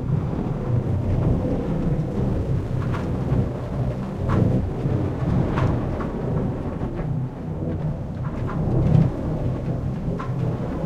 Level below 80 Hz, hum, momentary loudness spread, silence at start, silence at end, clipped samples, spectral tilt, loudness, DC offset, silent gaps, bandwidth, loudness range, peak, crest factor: -32 dBFS; none; 7 LU; 0 s; 0 s; under 0.1%; -9.5 dB/octave; -24 LUFS; under 0.1%; none; 7.4 kHz; 2 LU; -4 dBFS; 18 dB